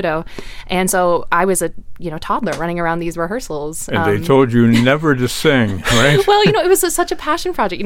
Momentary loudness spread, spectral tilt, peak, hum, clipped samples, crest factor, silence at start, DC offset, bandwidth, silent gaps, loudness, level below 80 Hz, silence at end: 12 LU; -4.5 dB/octave; -2 dBFS; none; under 0.1%; 14 dB; 0 s; under 0.1%; 17 kHz; none; -15 LUFS; -34 dBFS; 0 s